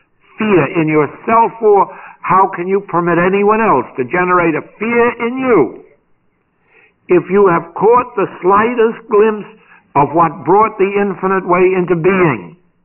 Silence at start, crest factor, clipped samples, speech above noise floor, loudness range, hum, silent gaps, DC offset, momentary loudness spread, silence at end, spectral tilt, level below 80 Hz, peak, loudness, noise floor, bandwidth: 0.4 s; 10 dB; under 0.1%; 47 dB; 2 LU; none; none; under 0.1%; 6 LU; 0.35 s; -6 dB/octave; -48 dBFS; -2 dBFS; -13 LUFS; -59 dBFS; 3.1 kHz